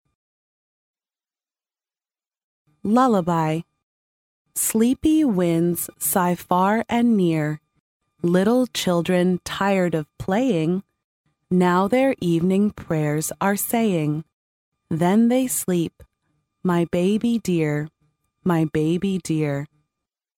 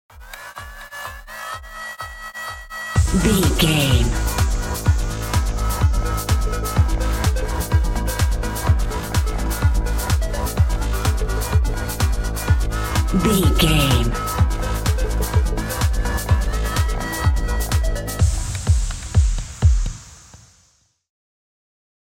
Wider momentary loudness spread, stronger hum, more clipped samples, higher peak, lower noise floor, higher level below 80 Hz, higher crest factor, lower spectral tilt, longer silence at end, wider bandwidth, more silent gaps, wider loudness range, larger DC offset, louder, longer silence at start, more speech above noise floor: second, 9 LU vs 14 LU; neither; neither; about the same, -4 dBFS vs -2 dBFS; first, under -90 dBFS vs -60 dBFS; second, -54 dBFS vs -22 dBFS; about the same, 18 dB vs 16 dB; about the same, -5.5 dB/octave vs -5 dB/octave; second, 0.7 s vs 1.8 s; about the same, 17 kHz vs 17 kHz; first, 3.83-4.45 s, 7.80-8.00 s, 11.04-11.24 s, 14.33-14.72 s vs none; about the same, 4 LU vs 3 LU; neither; about the same, -21 LUFS vs -21 LUFS; first, 2.85 s vs 0.15 s; first, over 70 dB vs 44 dB